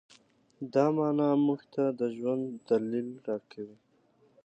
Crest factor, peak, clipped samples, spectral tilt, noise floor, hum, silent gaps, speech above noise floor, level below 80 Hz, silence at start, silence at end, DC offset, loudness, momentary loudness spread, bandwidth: 18 dB; -12 dBFS; under 0.1%; -8.5 dB/octave; -66 dBFS; none; none; 37 dB; -82 dBFS; 0.6 s; 0.7 s; under 0.1%; -30 LUFS; 16 LU; 8.2 kHz